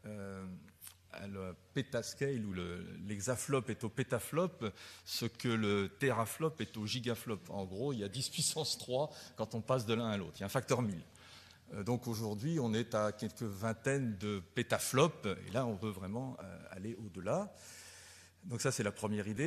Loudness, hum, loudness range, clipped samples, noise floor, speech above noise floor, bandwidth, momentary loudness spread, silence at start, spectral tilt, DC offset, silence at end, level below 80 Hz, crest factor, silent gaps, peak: -38 LUFS; none; 5 LU; under 0.1%; -58 dBFS; 21 dB; 13.5 kHz; 15 LU; 0.05 s; -4.5 dB/octave; under 0.1%; 0 s; -70 dBFS; 24 dB; none; -14 dBFS